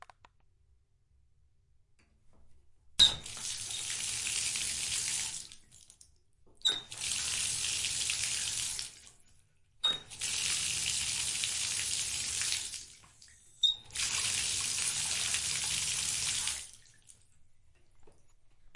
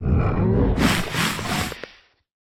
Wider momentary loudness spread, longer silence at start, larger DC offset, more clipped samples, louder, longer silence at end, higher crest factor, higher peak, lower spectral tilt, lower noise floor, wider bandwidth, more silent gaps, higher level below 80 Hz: second, 8 LU vs 12 LU; first, 2.3 s vs 0 s; neither; neither; second, -31 LUFS vs -22 LUFS; second, 0 s vs 0.6 s; first, 26 dB vs 16 dB; second, -10 dBFS vs -6 dBFS; second, 1.5 dB/octave vs -5 dB/octave; first, -68 dBFS vs -51 dBFS; second, 11.5 kHz vs 19 kHz; neither; second, -60 dBFS vs -30 dBFS